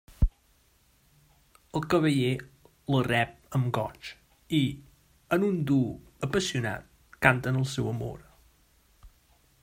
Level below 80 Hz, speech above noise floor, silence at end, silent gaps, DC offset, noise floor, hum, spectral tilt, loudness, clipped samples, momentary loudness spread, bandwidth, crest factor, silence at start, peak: -42 dBFS; 38 dB; 0.55 s; none; under 0.1%; -65 dBFS; none; -6 dB/octave; -28 LUFS; under 0.1%; 14 LU; 16 kHz; 28 dB; 0.1 s; -2 dBFS